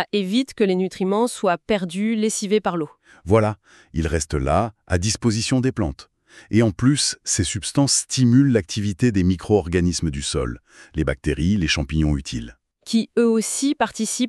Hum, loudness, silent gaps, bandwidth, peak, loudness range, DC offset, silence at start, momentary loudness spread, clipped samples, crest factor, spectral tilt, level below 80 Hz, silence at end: none; -21 LUFS; none; 13 kHz; -4 dBFS; 3 LU; under 0.1%; 0 s; 9 LU; under 0.1%; 16 dB; -5 dB/octave; -36 dBFS; 0 s